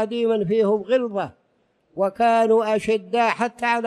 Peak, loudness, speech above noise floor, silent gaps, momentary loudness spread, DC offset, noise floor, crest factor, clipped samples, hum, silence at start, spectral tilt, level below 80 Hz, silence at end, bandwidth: -8 dBFS; -21 LUFS; 45 dB; none; 9 LU; under 0.1%; -66 dBFS; 14 dB; under 0.1%; none; 0 s; -5.5 dB/octave; -62 dBFS; 0 s; 11.5 kHz